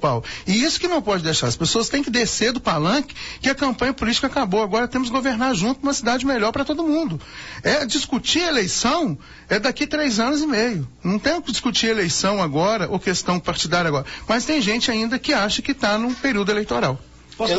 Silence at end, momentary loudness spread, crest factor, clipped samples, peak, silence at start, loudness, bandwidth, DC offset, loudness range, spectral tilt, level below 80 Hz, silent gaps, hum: 0 s; 4 LU; 14 dB; under 0.1%; -6 dBFS; 0 s; -20 LUFS; 8 kHz; under 0.1%; 1 LU; -3.5 dB/octave; -44 dBFS; none; none